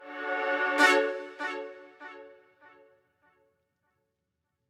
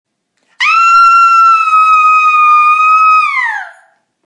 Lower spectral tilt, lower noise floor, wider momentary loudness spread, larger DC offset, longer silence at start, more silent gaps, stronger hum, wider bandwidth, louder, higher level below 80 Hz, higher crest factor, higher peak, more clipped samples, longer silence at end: first, -0.5 dB/octave vs 4 dB/octave; first, -82 dBFS vs -59 dBFS; first, 25 LU vs 9 LU; neither; second, 0 s vs 0.6 s; neither; neither; first, 16.5 kHz vs 10 kHz; second, -27 LUFS vs -6 LUFS; second, -78 dBFS vs -56 dBFS; first, 24 dB vs 8 dB; second, -8 dBFS vs 0 dBFS; neither; first, 2.4 s vs 0.55 s